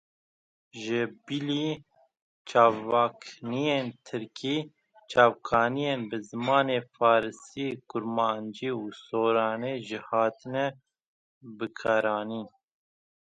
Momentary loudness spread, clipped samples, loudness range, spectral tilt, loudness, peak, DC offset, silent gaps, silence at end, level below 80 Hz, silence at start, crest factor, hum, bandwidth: 15 LU; under 0.1%; 4 LU; -5.5 dB/octave; -28 LUFS; -6 dBFS; under 0.1%; 2.22-2.45 s, 11.08-11.41 s; 0.8 s; -70 dBFS; 0.75 s; 22 dB; none; 9 kHz